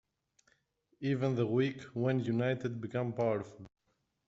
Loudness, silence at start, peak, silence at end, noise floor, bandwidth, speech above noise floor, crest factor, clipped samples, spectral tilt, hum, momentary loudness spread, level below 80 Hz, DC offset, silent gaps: -34 LUFS; 1 s; -18 dBFS; 0.6 s; -80 dBFS; 7.8 kHz; 47 dB; 18 dB; under 0.1%; -7 dB/octave; none; 6 LU; -72 dBFS; under 0.1%; none